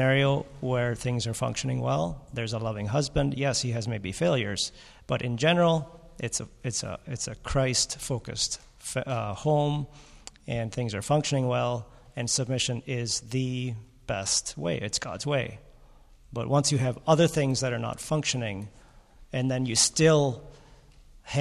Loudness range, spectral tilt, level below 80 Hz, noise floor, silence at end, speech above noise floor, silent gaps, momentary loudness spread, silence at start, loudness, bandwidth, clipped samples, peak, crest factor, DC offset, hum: 3 LU; -4.5 dB/octave; -50 dBFS; -53 dBFS; 0 s; 26 dB; none; 12 LU; 0 s; -28 LUFS; 13.5 kHz; under 0.1%; -8 dBFS; 20 dB; under 0.1%; none